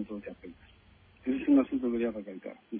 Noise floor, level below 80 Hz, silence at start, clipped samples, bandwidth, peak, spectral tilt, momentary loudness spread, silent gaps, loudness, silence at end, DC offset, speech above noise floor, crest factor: -60 dBFS; -62 dBFS; 0 s; under 0.1%; 3.7 kHz; -16 dBFS; -10 dB/octave; 21 LU; none; -30 LUFS; 0 s; under 0.1%; 24 dB; 16 dB